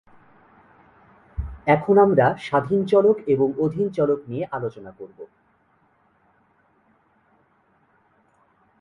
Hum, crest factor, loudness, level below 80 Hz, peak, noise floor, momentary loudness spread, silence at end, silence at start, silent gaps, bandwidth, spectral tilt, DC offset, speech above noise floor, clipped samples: none; 20 dB; -20 LUFS; -46 dBFS; -4 dBFS; -63 dBFS; 22 LU; 3.55 s; 1.4 s; none; 6.8 kHz; -8.5 dB/octave; under 0.1%; 43 dB; under 0.1%